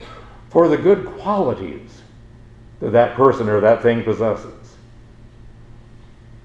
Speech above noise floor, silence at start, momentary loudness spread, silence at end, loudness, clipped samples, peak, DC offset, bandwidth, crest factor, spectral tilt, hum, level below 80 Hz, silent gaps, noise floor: 27 dB; 0 s; 16 LU; 0.95 s; -17 LUFS; under 0.1%; 0 dBFS; under 0.1%; 8 kHz; 18 dB; -8 dB/octave; none; -46 dBFS; none; -43 dBFS